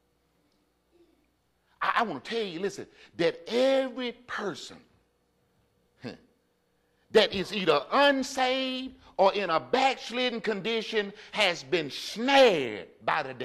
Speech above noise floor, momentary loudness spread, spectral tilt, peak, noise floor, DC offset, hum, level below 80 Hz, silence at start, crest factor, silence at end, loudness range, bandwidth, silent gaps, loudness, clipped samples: 44 dB; 13 LU; -3.5 dB/octave; -10 dBFS; -71 dBFS; under 0.1%; none; -68 dBFS; 1.8 s; 18 dB; 0 s; 7 LU; 13.5 kHz; none; -27 LUFS; under 0.1%